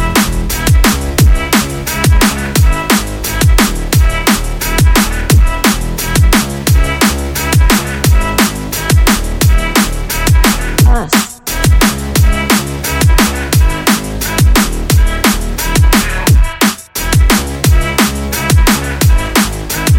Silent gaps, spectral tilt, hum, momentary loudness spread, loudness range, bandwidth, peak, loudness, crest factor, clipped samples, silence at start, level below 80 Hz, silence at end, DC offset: none; -4 dB/octave; none; 4 LU; 1 LU; 17.5 kHz; 0 dBFS; -11 LUFS; 10 dB; under 0.1%; 0 s; -14 dBFS; 0 s; under 0.1%